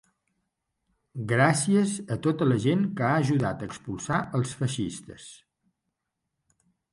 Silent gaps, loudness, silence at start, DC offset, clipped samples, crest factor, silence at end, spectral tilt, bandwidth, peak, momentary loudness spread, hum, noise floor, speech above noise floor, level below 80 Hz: none; -26 LUFS; 1.15 s; under 0.1%; under 0.1%; 20 dB; 1.55 s; -6 dB/octave; 11.5 kHz; -8 dBFS; 17 LU; none; -83 dBFS; 57 dB; -60 dBFS